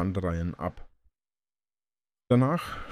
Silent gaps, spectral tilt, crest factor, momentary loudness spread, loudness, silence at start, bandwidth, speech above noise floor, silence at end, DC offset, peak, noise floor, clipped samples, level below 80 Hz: none; -8 dB/octave; 22 dB; 12 LU; -28 LUFS; 0 s; 14.5 kHz; over 63 dB; 0 s; under 0.1%; -10 dBFS; under -90 dBFS; under 0.1%; -48 dBFS